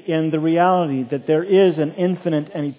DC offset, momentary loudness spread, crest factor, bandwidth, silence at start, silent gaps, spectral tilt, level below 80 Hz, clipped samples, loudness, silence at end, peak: under 0.1%; 7 LU; 14 dB; 4 kHz; 0.05 s; none; -11.5 dB/octave; -72 dBFS; under 0.1%; -18 LUFS; 0.05 s; -4 dBFS